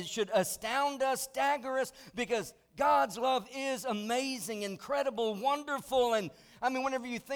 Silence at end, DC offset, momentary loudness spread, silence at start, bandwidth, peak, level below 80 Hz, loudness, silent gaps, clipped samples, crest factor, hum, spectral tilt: 0 s; under 0.1%; 8 LU; 0 s; over 20 kHz; -18 dBFS; -68 dBFS; -32 LUFS; none; under 0.1%; 16 dB; none; -3 dB/octave